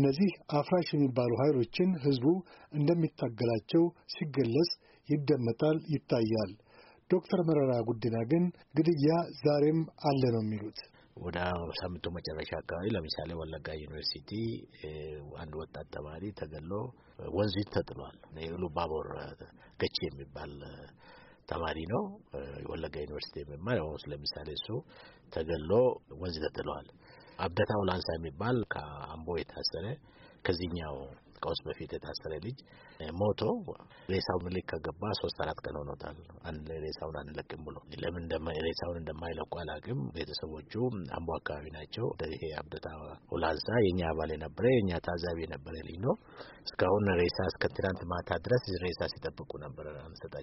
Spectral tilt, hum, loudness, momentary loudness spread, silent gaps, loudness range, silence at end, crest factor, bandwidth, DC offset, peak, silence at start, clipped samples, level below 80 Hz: -5.5 dB/octave; none; -34 LUFS; 15 LU; none; 9 LU; 0 s; 20 dB; 5.8 kHz; under 0.1%; -14 dBFS; 0 s; under 0.1%; -54 dBFS